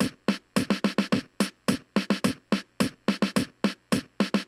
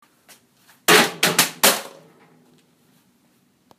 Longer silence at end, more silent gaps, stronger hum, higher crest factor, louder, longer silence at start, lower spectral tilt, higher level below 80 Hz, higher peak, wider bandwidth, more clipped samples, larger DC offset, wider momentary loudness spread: second, 0.05 s vs 1.9 s; neither; neither; about the same, 20 dB vs 22 dB; second, -28 LUFS vs -16 LUFS; second, 0 s vs 0.9 s; first, -5 dB/octave vs -1 dB/octave; first, -60 dBFS vs -66 dBFS; second, -8 dBFS vs 0 dBFS; about the same, 15 kHz vs 15.5 kHz; neither; neither; second, 4 LU vs 11 LU